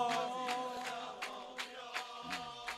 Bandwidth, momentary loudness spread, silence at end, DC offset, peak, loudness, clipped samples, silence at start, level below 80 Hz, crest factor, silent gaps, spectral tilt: 16 kHz; 7 LU; 0 s; under 0.1%; -24 dBFS; -41 LUFS; under 0.1%; 0 s; -78 dBFS; 18 dB; none; -2 dB/octave